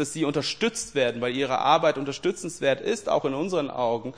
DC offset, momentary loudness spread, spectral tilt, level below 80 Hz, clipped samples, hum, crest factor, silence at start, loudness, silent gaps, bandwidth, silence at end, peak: 0.2%; 6 LU; -4 dB/octave; -60 dBFS; under 0.1%; none; 20 dB; 0 s; -25 LUFS; none; 10.5 kHz; 0 s; -6 dBFS